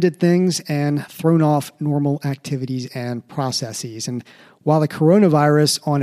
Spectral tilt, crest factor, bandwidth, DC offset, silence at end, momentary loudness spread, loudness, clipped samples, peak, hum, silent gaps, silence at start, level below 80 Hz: -6 dB/octave; 16 dB; 15 kHz; under 0.1%; 0 s; 13 LU; -19 LUFS; under 0.1%; -2 dBFS; none; none; 0 s; -64 dBFS